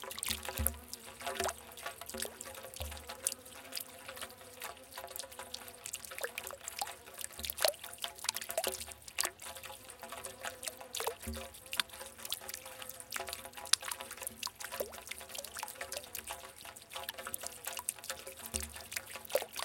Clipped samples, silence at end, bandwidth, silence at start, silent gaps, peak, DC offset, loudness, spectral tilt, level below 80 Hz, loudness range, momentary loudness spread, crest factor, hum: under 0.1%; 0 s; 17 kHz; 0 s; none; -6 dBFS; under 0.1%; -40 LUFS; -1 dB/octave; -58 dBFS; 5 LU; 10 LU; 38 dB; none